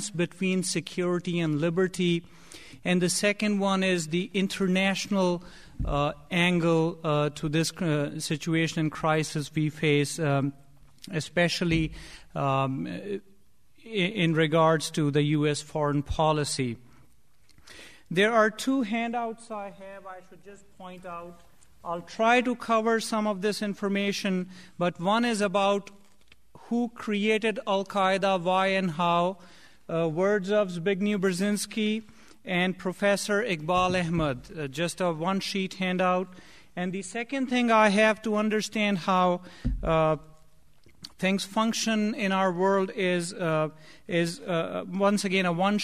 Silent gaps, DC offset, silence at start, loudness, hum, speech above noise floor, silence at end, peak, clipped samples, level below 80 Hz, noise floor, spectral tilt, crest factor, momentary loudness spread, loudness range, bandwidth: none; 0.2%; 0 s; -27 LUFS; none; 37 dB; 0 s; -8 dBFS; under 0.1%; -48 dBFS; -64 dBFS; -5 dB/octave; 18 dB; 11 LU; 3 LU; 14.5 kHz